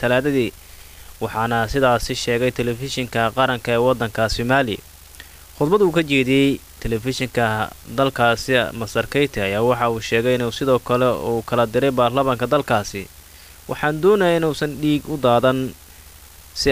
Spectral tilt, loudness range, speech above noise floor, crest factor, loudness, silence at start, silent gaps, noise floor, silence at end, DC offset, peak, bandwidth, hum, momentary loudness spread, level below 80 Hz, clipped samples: -5.5 dB/octave; 2 LU; 24 dB; 14 dB; -19 LUFS; 0 s; none; -43 dBFS; 0 s; 0.3%; -4 dBFS; 16 kHz; none; 10 LU; -42 dBFS; under 0.1%